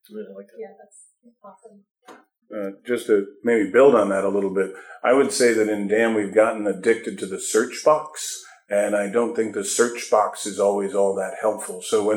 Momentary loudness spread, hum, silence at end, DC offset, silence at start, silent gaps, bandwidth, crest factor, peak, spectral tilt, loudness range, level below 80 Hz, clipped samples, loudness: 14 LU; none; 0 s; under 0.1%; 0.1 s; none; 18.5 kHz; 18 dB; -4 dBFS; -4 dB/octave; 4 LU; -76 dBFS; under 0.1%; -21 LUFS